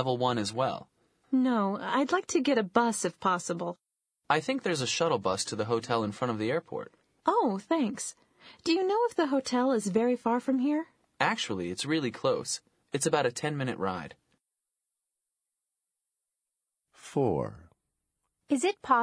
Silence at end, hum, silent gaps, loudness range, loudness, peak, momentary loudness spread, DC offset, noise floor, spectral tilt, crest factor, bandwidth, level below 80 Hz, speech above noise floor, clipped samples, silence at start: 0 s; none; none; 9 LU; -29 LUFS; -8 dBFS; 9 LU; under 0.1%; -87 dBFS; -4.5 dB/octave; 22 dB; 11 kHz; -70 dBFS; 58 dB; under 0.1%; 0 s